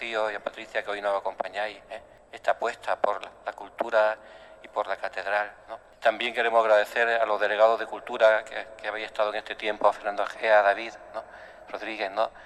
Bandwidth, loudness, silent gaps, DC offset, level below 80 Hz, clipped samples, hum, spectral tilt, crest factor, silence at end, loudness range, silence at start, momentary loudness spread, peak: 12.5 kHz; -26 LUFS; none; under 0.1%; -66 dBFS; under 0.1%; none; -2.5 dB/octave; 20 dB; 0 s; 6 LU; 0 s; 17 LU; -6 dBFS